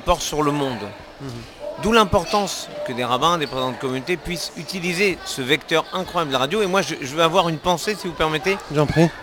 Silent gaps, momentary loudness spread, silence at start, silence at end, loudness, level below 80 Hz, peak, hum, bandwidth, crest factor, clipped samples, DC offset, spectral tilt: none; 10 LU; 0 s; 0 s; -21 LUFS; -42 dBFS; 0 dBFS; none; 19 kHz; 20 dB; under 0.1%; under 0.1%; -4.5 dB/octave